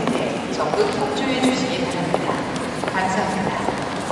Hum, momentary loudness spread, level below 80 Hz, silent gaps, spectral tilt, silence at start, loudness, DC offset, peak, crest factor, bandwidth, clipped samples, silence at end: none; 5 LU; -50 dBFS; none; -4.5 dB/octave; 0 s; -22 LUFS; under 0.1%; -2 dBFS; 20 dB; 11.5 kHz; under 0.1%; 0 s